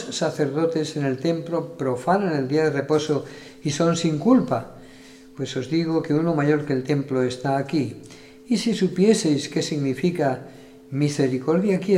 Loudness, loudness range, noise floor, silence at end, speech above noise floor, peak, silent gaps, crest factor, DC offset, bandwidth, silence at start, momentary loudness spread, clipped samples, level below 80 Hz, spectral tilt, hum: -23 LUFS; 2 LU; -45 dBFS; 0 s; 23 dB; -4 dBFS; none; 18 dB; under 0.1%; 14 kHz; 0 s; 10 LU; under 0.1%; -60 dBFS; -6 dB/octave; none